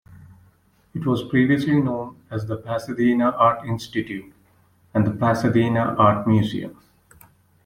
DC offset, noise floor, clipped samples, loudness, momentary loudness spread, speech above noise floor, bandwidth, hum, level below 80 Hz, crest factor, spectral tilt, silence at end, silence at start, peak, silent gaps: under 0.1%; -58 dBFS; under 0.1%; -21 LUFS; 14 LU; 38 dB; 15.5 kHz; none; -56 dBFS; 18 dB; -8 dB/octave; 0.95 s; 0.1 s; -4 dBFS; none